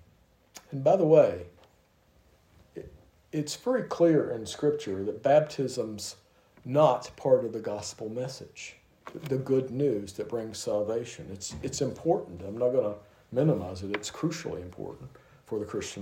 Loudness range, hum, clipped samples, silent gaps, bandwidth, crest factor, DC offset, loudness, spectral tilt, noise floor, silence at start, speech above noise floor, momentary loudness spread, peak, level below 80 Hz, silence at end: 4 LU; none; under 0.1%; none; 16 kHz; 22 dB; under 0.1%; -29 LUFS; -6 dB/octave; -64 dBFS; 0.55 s; 36 dB; 18 LU; -8 dBFS; -64 dBFS; 0 s